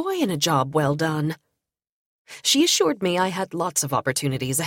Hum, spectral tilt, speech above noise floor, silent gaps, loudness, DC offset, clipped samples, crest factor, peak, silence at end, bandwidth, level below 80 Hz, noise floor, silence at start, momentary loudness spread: none; -3.5 dB/octave; 57 dB; 1.92-2.25 s; -22 LUFS; under 0.1%; under 0.1%; 18 dB; -6 dBFS; 0 s; 17 kHz; -60 dBFS; -79 dBFS; 0 s; 8 LU